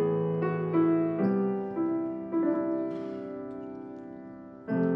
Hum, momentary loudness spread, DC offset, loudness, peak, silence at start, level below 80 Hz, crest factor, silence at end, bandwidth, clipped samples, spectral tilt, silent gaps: none; 17 LU; under 0.1%; -30 LUFS; -16 dBFS; 0 s; -72 dBFS; 14 dB; 0 s; 3.6 kHz; under 0.1%; -11.5 dB/octave; none